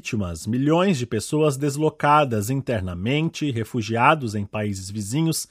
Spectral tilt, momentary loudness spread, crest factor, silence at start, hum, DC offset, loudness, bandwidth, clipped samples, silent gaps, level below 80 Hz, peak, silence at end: -5.5 dB/octave; 9 LU; 20 dB; 0.05 s; none; under 0.1%; -22 LUFS; 16 kHz; under 0.1%; none; -58 dBFS; -2 dBFS; 0.05 s